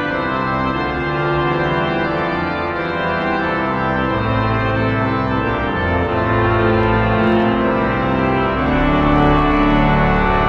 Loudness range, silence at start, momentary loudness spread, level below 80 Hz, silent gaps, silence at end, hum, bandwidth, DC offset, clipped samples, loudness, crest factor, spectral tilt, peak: 3 LU; 0 s; 5 LU; -28 dBFS; none; 0 s; none; 7 kHz; under 0.1%; under 0.1%; -17 LUFS; 14 dB; -8.5 dB/octave; -2 dBFS